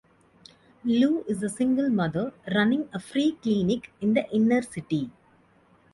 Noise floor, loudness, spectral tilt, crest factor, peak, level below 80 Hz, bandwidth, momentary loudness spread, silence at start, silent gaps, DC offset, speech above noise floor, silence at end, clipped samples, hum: -60 dBFS; -26 LUFS; -6 dB/octave; 16 dB; -10 dBFS; -62 dBFS; 11.5 kHz; 7 LU; 0.85 s; none; under 0.1%; 35 dB; 0.85 s; under 0.1%; none